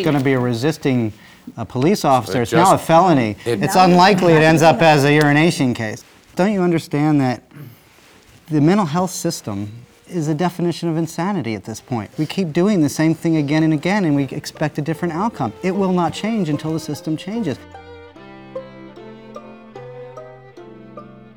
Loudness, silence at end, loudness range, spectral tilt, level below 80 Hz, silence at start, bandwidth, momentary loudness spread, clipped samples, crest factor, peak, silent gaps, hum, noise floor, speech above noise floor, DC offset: -17 LUFS; 0.15 s; 14 LU; -6 dB/octave; -54 dBFS; 0 s; over 20 kHz; 23 LU; under 0.1%; 16 dB; 0 dBFS; none; none; -48 dBFS; 32 dB; 0.1%